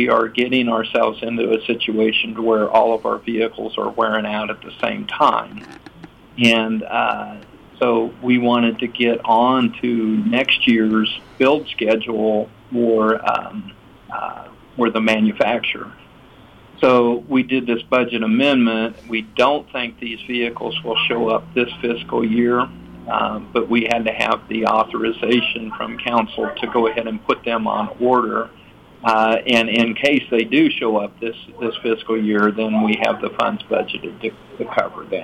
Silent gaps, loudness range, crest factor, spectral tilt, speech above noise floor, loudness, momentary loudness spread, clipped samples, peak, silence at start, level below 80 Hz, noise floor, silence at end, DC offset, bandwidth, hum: none; 3 LU; 16 dB; -5.5 dB/octave; 27 dB; -18 LUFS; 10 LU; under 0.1%; -2 dBFS; 0 s; -54 dBFS; -45 dBFS; 0 s; under 0.1%; 9.2 kHz; none